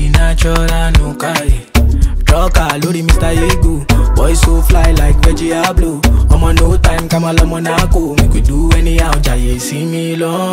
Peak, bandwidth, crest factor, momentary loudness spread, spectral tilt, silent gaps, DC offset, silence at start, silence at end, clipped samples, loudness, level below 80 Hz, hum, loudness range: 0 dBFS; 16 kHz; 10 dB; 5 LU; -5.5 dB/octave; none; under 0.1%; 0 s; 0 s; under 0.1%; -12 LUFS; -12 dBFS; none; 1 LU